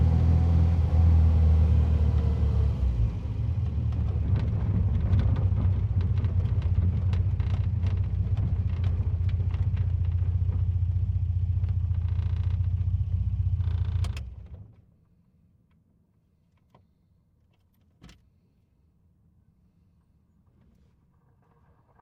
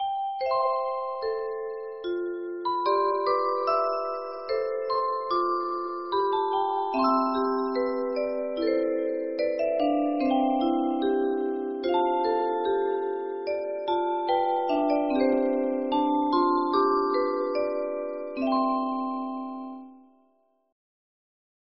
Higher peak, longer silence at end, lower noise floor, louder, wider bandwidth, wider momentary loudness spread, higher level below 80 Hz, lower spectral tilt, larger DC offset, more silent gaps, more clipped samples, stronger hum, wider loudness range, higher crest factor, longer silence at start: about the same, -12 dBFS vs -12 dBFS; first, 3.95 s vs 1.7 s; about the same, -66 dBFS vs -67 dBFS; about the same, -26 LUFS vs -27 LUFS; second, 4.5 kHz vs 5.8 kHz; about the same, 6 LU vs 8 LU; first, -32 dBFS vs -66 dBFS; first, -9.5 dB/octave vs -2 dB/octave; second, under 0.1% vs 0.1%; neither; neither; neither; first, 7 LU vs 4 LU; about the same, 14 dB vs 16 dB; about the same, 0 s vs 0 s